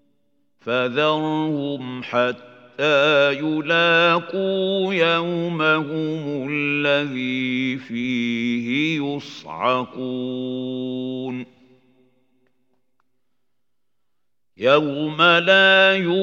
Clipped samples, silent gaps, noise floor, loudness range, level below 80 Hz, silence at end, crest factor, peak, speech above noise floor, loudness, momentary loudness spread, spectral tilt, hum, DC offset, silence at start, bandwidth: under 0.1%; none; -82 dBFS; 12 LU; -74 dBFS; 0 s; 20 dB; -2 dBFS; 62 dB; -20 LUFS; 13 LU; -5.5 dB/octave; none; under 0.1%; 0.65 s; 7.6 kHz